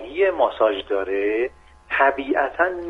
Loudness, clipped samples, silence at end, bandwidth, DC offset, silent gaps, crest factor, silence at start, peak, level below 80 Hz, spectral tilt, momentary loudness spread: -21 LUFS; under 0.1%; 0 s; 5.6 kHz; under 0.1%; none; 18 dB; 0 s; -4 dBFS; -52 dBFS; -5.5 dB/octave; 6 LU